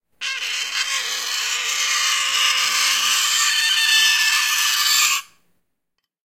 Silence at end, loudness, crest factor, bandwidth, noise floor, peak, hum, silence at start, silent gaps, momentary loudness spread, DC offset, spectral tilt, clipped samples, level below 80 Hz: 1 s; -17 LUFS; 18 dB; 16.5 kHz; -77 dBFS; -4 dBFS; none; 0.2 s; none; 8 LU; 0.1%; 5 dB/octave; under 0.1%; -74 dBFS